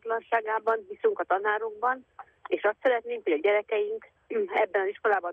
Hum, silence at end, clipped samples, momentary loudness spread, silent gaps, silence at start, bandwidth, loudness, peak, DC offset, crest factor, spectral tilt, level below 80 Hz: none; 0 s; under 0.1%; 8 LU; none; 0.05 s; 4 kHz; -28 LUFS; -12 dBFS; under 0.1%; 16 dB; -5 dB/octave; -78 dBFS